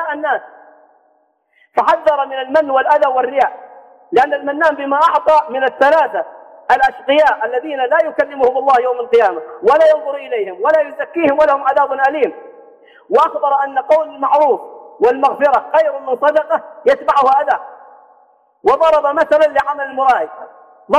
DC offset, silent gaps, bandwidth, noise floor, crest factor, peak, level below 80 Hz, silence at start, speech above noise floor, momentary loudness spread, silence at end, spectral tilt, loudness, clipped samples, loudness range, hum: under 0.1%; none; 9.2 kHz; -59 dBFS; 14 dB; -2 dBFS; -56 dBFS; 0 s; 45 dB; 7 LU; 0 s; -4 dB/octave; -14 LUFS; under 0.1%; 2 LU; none